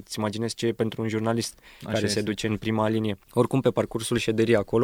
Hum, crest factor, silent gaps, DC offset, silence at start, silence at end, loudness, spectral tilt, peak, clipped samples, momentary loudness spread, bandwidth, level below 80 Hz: none; 18 dB; none; under 0.1%; 0 s; 0 s; -26 LUFS; -5.5 dB/octave; -6 dBFS; under 0.1%; 6 LU; 17 kHz; -54 dBFS